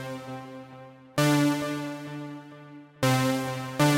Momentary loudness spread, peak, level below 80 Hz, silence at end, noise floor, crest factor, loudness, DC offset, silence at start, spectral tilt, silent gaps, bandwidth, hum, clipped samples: 22 LU; -10 dBFS; -64 dBFS; 0 s; -47 dBFS; 18 dB; -27 LUFS; under 0.1%; 0 s; -5 dB/octave; none; 16 kHz; none; under 0.1%